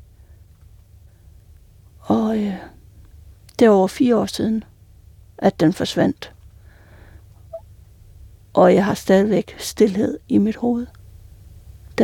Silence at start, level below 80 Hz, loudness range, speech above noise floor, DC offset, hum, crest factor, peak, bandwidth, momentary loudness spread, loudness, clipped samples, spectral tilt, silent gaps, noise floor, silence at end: 2.05 s; -48 dBFS; 6 LU; 30 dB; under 0.1%; none; 18 dB; -2 dBFS; 17 kHz; 20 LU; -18 LUFS; under 0.1%; -6.5 dB/octave; none; -47 dBFS; 0 s